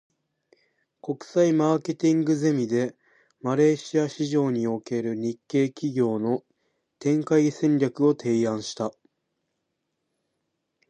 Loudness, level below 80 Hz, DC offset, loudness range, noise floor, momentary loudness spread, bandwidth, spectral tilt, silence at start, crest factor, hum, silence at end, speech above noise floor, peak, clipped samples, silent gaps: -25 LUFS; -74 dBFS; under 0.1%; 3 LU; -79 dBFS; 10 LU; 9.4 kHz; -6.5 dB/octave; 1.05 s; 16 dB; none; 2 s; 55 dB; -8 dBFS; under 0.1%; none